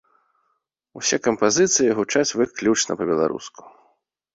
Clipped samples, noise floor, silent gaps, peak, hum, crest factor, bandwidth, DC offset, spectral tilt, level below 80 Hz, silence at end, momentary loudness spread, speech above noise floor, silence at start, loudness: under 0.1%; -73 dBFS; none; -4 dBFS; none; 20 dB; 8 kHz; under 0.1%; -3 dB/octave; -62 dBFS; 0.85 s; 8 LU; 52 dB; 0.95 s; -20 LUFS